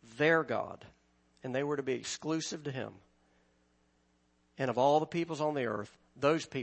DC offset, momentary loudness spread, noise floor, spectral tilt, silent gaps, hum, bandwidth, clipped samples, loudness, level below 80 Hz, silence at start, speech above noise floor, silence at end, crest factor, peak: under 0.1%; 15 LU; -72 dBFS; -5 dB/octave; none; none; 8.6 kHz; under 0.1%; -33 LUFS; -74 dBFS; 0.1 s; 40 dB; 0 s; 20 dB; -14 dBFS